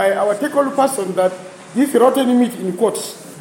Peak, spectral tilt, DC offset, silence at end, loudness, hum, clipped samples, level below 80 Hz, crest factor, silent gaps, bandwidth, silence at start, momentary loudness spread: -2 dBFS; -4.5 dB/octave; under 0.1%; 0 s; -17 LUFS; none; under 0.1%; -70 dBFS; 16 dB; none; 17 kHz; 0 s; 12 LU